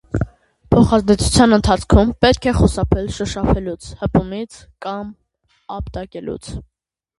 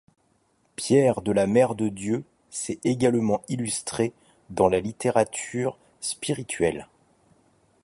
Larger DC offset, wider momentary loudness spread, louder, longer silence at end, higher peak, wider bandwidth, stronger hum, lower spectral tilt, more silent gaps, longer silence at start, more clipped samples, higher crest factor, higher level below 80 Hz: neither; first, 17 LU vs 12 LU; first, -16 LUFS vs -25 LUFS; second, 0.55 s vs 1 s; first, 0 dBFS vs -4 dBFS; about the same, 11.5 kHz vs 11.5 kHz; neither; about the same, -6 dB/octave vs -5 dB/octave; neither; second, 0.15 s vs 0.8 s; neither; about the same, 18 dB vs 20 dB; first, -26 dBFS vs -56 dBFS